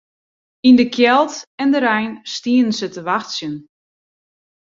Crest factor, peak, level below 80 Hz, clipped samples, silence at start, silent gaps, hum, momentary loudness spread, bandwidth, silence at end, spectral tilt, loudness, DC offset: 16 dB; -2 dBFS; -62 dBFS; under 0.1%; 0.65 s; 1.47-1.58 s; none; 13 LU; 7.6 kHz; 1.1 s; -4 dB/octave; -16 LUFS; under 0.1%